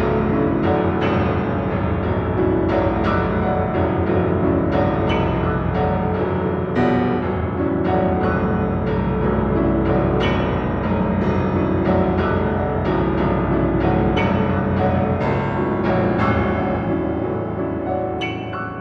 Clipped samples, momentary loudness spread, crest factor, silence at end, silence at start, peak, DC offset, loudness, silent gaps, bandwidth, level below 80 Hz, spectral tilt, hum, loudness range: under 0.1%; 4 LU; 14 dB; 0 s; 0 s; -6 dBFS; under 0.1%; -20 LUFS; none; 6.4 kHz; -32 dBFS; -9.5 dB/octave; none; 1 LU